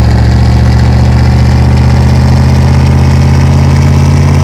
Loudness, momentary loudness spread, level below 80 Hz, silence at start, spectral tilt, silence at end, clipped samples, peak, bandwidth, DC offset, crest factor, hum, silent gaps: -6 LUFS; 0 LU; -10 dBFS; 0 s; -7.5 dB/octave; 0 s; 10%; 0 dBFS; 11.5 kHz; 3%; 4 dB; none; none